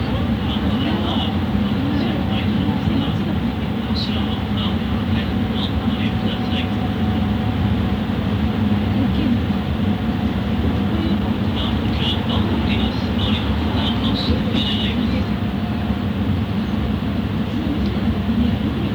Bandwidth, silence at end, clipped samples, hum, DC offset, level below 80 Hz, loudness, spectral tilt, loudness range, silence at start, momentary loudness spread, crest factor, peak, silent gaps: over 20 kHz; 0 s; under 0.1%; none; under 0.1%; -30 dBFS; -20 LUFS; -7.5 dB/octave; 1 LU; 0 s; 3 LU; 14 dB; -6 dBFS; none